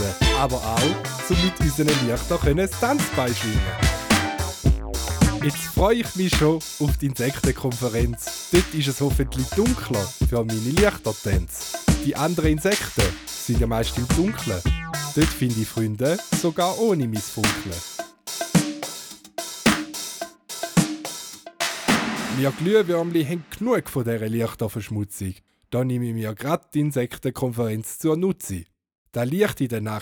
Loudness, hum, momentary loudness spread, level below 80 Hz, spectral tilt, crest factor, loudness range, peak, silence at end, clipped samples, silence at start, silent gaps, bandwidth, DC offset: -23 LUFS; none; 10 LU; -32 dBFS; -5 dB/octave; 20 dB; 4 LU; -4 dBFS; 0 s; under 0.1%; 0 s; 28.98-29.05 s; over 20 kHz; under 0.1%